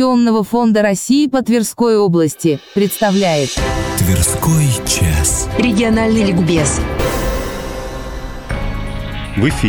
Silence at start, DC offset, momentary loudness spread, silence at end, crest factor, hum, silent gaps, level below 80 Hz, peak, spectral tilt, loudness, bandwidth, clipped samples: 0 s; under 0.1%; 11 LU; 0 s; 12 dB; none; none; -26 dBFS; -4 dBFS; -5 dB/octave; -15 LUFS; over 20 kHz; under 0.1%